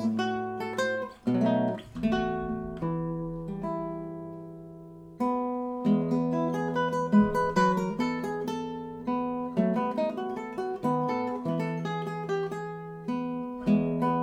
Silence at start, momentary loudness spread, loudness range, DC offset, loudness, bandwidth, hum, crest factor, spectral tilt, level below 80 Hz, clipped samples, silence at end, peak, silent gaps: 0 s; 11 LU; 6 LU; under 0.1%; -29 LUFS; 12.5 kHz; none; 18 dB; -7.5 dB/octave; -54 dBFS; under 0.1%; 0 s; -12 dBFS; none